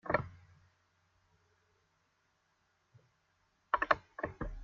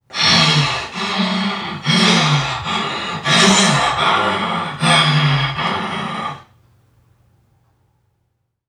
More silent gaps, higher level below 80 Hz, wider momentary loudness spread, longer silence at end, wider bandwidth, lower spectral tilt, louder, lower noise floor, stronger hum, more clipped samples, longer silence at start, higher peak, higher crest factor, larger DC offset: neither; second, -56 dBFS vs -48 dBFS; about the same, 12 LU vs 11 LU; second, 0 s vs 2.25 s; second, 7.2 kHz vs 13.5 kHz; about the same, -3.5 dB/octave vs -3.5 dB/octave; second, -36 LUFS vs -15 LUFS; first, -77 dBFS vs -68 dBFS; neither; neither; about the same, 0.05 s vs 0.1 s; second, -10 dBFS vs 0 dBFS; first, 30 dB vs 16 dB; neither